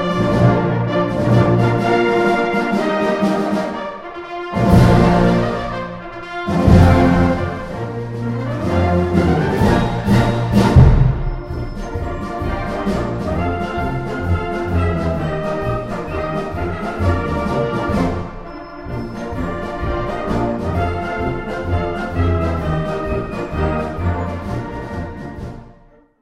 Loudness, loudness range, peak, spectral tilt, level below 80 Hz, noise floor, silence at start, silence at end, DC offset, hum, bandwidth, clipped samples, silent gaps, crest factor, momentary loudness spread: -18 LUFS; 7 LU; 0 dBFS; -8 dB/octave; -28 dBFS; -48 dBFS; 0 s; 0.5 s; under 0.1%; none; 13.5 kHz; under 0.1%; none; 16 dB; 14 LU